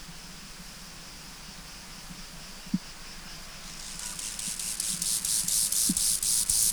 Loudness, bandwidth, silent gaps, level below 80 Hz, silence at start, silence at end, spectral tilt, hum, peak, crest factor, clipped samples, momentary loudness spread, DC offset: -26 LUFS; over 20 kHz; none; -50 dBFS; 0 s; 0 s; -0.5 dB/octave; none; -12 dBFS; 20 dB; under 0.1%; 20 LU; under 0.1%